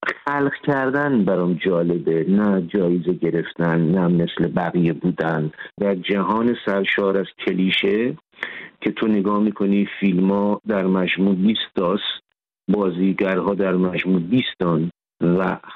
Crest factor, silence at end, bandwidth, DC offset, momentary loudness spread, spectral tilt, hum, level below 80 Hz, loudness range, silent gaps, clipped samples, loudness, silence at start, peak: 12 dB; 0 s; 4.9 kHz; under 0.1%; 6 LU; -9 dB/octave; none; -58 dBFS; 1 LU; none; under 0.1%; -20 LUFS; 0 s; -6 dBFS